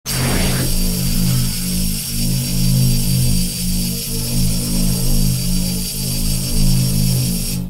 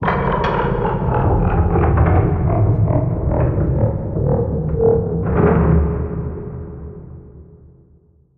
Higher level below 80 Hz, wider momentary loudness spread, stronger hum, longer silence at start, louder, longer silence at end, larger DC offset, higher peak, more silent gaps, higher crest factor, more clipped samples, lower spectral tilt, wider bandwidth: about the same, -20 dBFS vs -24 dBFS; second, 4 LU vs 14 LU; neither; about the same, 0.05 s vs 0 s; about the same, -18 LUFS vs -17 LUFS; second, 0 s vs 0.95 s; neither; about the same, -4 dBFS vs -2 dBFS; neither; about the same, 12 dB vs 16 dB; neither; second, -4 dB/octave vs -11 dB/octave; first, 16.5 kHz vs 4.7 kHz